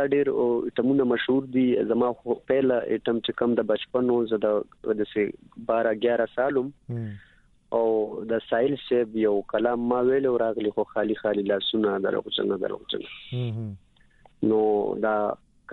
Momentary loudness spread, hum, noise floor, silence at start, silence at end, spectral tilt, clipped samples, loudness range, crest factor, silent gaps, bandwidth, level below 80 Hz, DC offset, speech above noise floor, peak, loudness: 8 LU; none; -57 dBFS; 0 s; 0 s; -9 dB/octave; under 0.1%; 3 LU; 16 dB; none; 4.3 kHz; -62 dBFS; under 0.1%; 32 dB; -10 dBFS; -25 LUFS